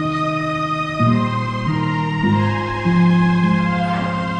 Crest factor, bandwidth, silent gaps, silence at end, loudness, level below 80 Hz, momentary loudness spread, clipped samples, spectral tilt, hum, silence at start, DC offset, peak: 12 dB; 8.6 kHz; none; 0 s; -18 LUFS; -42 dBFS; 6 LU; under 0.1%; -7.5 dB/octave; none; 0 s; under 0.1%; -4 dBFS